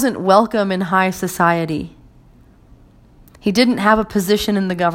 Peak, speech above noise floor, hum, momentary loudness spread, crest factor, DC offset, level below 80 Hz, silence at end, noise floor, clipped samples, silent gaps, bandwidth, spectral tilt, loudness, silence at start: 0 dBFS; 31 dB; none; 9 LU; 18 dB; under 0.1%; -44 dBFS; 0 s; -47 dBFS; under 0.1%; none; 16.5 kHz; -5 dB/octave; -16 LUFS; 0 s